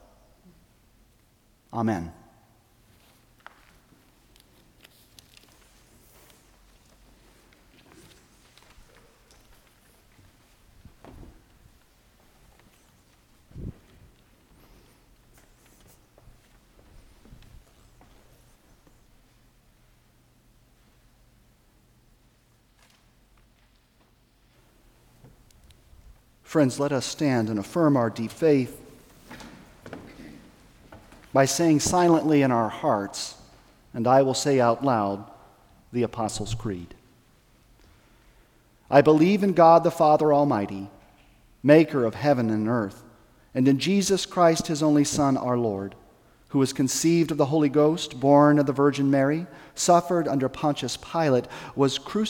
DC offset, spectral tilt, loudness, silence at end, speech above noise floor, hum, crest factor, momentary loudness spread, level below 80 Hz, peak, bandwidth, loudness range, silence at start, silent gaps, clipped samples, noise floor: under 0.1%; -5.5 dB/octave; -23 LUFS; 0 s; 40 dB; none; 22 dB; 19 LU; -56 dBFS; -4 dBFS; 17 kHz; 13 LU; 1.75 s; none; under 0.1%; -62 dBFS